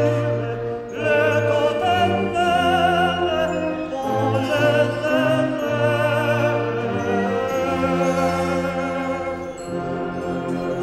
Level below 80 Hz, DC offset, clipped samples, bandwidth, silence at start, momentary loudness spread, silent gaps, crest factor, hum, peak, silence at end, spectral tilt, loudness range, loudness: -48 dBFS; under 0.1%; under 0.1%; 15 kHz; 0 s; 8 LU; none; 14 dB; none; -6 dBFS; 0 s; -6 dB/octave; 3 LU; -21 LUFS